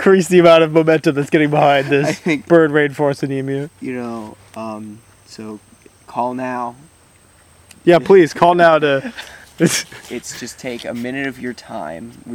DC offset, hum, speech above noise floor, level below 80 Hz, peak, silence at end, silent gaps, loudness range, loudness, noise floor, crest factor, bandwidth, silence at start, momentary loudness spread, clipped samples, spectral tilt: under 0.1%; none; 34 dB; -56 dBFS; 0 dBFS; 0 s; none; 13 LU; -15 LUFS; -50 dBFS; 16 dB; 16 kHz; 0 s; 21 LU; under 0.1%; -5.5 dB/octave